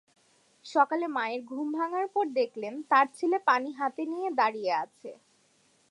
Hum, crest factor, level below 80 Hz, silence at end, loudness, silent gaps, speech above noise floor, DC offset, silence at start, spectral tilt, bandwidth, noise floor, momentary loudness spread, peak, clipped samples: none; 20 dB; -90 dBFS; 0.75 s; -29 LUFS; none; 38 dB; under 0.1%; 0.65 s; -4 dB/octave; 11 kHz; -67 dBFS; 9 LU; -10 dBFS; under 0.1%